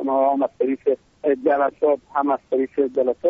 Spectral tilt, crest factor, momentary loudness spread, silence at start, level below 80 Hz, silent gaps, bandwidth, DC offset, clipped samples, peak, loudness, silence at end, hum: -5 dB/octave; 12 dB; 4 LU; 0 s; -64 dBFS; none; 3.9 kHz; under 0.1%; under 0.1%; -8 dBFS; -21 LUFS; 0 s; none